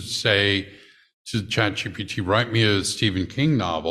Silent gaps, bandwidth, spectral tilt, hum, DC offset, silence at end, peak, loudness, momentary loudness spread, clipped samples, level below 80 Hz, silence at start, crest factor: 1.13-1.25 s; 13.5 kHz; -4.5 dB/octave; none; under 0.1%; 0 s; -4 dBFS; -22 LUFS; 10 LU; under 0.1%; -52 dBFS; 0 s; 20 dB